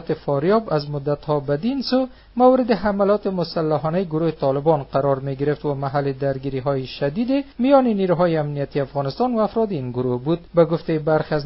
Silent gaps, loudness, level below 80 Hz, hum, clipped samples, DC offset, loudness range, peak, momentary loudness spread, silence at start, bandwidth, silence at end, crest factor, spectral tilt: none; -21 LUFS; -48 dBFS; none; under 0.1%; under 0.1%; 2 LU; -2 dBFS; 7 LU; 0 s; 5.8 kHz; 0 s; 18 dB; -6.5 dB/octave